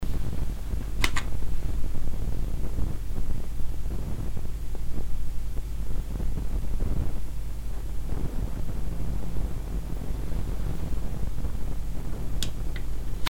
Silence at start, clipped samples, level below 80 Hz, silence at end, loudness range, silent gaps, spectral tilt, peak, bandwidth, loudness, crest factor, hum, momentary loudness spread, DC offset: 0 s; under 0.1%; -30 dBFS; 0.05 s; 2 LU; none; -5.5 dB/octave; -6 dBFS; 14.5 kHz; -34 LUFS; 16 dB; none; 4 LU; under 0.1%